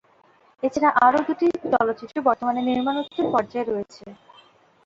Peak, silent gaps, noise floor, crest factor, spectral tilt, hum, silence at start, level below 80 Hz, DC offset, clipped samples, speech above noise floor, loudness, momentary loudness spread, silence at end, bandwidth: -4 dBFS; none; -57 dBFS; 20 dB; -5.5 dB/octave; none; 0.65 s; -62 dBFS; under 0.1%; under 0.1%; 36 dB; -22 LUFS; 10 LU; 0.7 s; 7.8 kHz